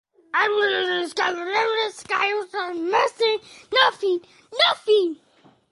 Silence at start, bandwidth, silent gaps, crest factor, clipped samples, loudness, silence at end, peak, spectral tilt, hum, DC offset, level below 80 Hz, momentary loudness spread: 0.35 s; 11.5 kHz; none; 18 dB; under 0.1%; -22 LUFS; 0.55 s; -4 dBFS; -2 dB/octave; none; under 0.1%; -72 dBFS; 9 LU